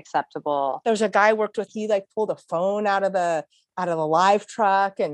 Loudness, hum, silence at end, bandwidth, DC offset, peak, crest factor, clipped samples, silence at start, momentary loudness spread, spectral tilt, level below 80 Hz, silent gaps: -23 LUFS; none; 0 s; 10.5 kHz; under 0.1%; -4 dBFS; 18 dB; under 0.1%; 0.15 s; 9 LU; -4.5 dB/octave; -76 dBFS; none